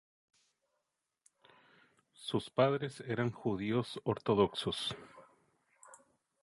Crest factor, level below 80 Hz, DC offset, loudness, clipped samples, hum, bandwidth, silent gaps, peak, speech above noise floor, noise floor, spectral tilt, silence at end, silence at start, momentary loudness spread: 22 dB; -68 dBFS; under 0.1%; -35 LUFS; under 0.1%; none; 11.5 kHz; none; -16 dBFS; 52 dB; -86 dBFS; -6 dB/octave; 0.45 s; 2.2 s; 8 LU